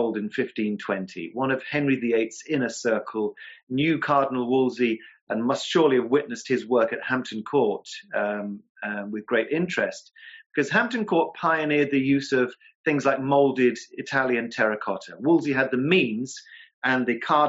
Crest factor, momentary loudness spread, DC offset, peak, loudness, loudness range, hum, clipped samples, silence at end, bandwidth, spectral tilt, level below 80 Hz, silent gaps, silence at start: 18 dB; 10 LU; under 0.1%; -8 dBFS; -24 LUFS; 4 LU; none; under 0.1%; 0 s; 8 kHz; -4 dB/octave; -72 dBFS; 3.63-3.67 s, 5.21-5.27 s, 8.69-8.75 s, 10.46-10.50 s, 12.75-12.84 s, 16.74-16.82 s; 0 s